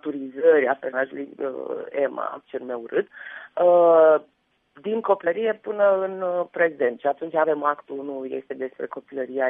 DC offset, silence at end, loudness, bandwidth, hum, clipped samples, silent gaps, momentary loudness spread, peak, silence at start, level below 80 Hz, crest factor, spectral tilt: under 0.1%; 0 s; -23 LUFS; 3.7 kHz; none; under 0.1%; none; 15 LU; -6 dBFS; 0.05 s; -78 dBFS; 16 dB; -8.5 dB/octave